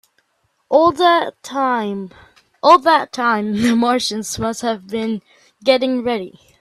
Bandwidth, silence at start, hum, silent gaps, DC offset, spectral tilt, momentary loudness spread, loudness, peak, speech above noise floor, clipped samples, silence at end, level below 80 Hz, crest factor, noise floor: 14 kHz; 0.7 s; none; none; under 0.1%; -4 dB/octave; 13 LU; -17 LUFS; 0 dBFS; 49 dB; under 0.1%; 0.3 s; -54 dBFS; 18 dB; -66 dBFS